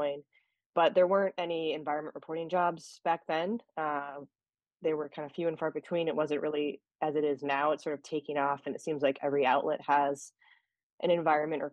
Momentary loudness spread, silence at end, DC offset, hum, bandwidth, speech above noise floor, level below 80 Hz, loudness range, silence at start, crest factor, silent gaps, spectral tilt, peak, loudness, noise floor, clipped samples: 9 LU; 0.05 s; under 0.1%; none; 11 kHz; 42 dB; -82 dBFS; 4 LU; 0 s; 18 dB; 0.66-0.73 s, 6.95-6.99 s, 10.83-10.98 s; -5.5 dB/octave; -14 dBFS; -32 LUFS; -73 dBFS; under 0.1%